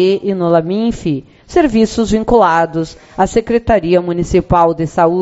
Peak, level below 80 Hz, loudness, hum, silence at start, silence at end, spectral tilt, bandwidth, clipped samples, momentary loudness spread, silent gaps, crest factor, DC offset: 0 dBFS; -32 dBFS; -13 LUFS; none; 0 s; 0 s; -6.5 dB/octave; 8.2 kHz; under 0.1%; 7 LU; none; 12 dB; under 0.1%